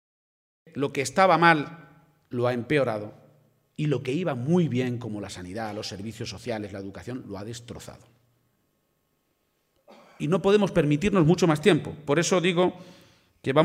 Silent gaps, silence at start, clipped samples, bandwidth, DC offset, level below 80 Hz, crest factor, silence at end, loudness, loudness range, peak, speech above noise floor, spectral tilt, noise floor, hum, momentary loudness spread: none; 0.75 s; under 0.1%; 15 kHz; under 0.1%; -56 dBFS; 24 dB; 0 s; -25 LUFS; 15 LU; -4 dBFS; 48 dB; -5.5 dB/octave; -72 dBFS; none; 17 LU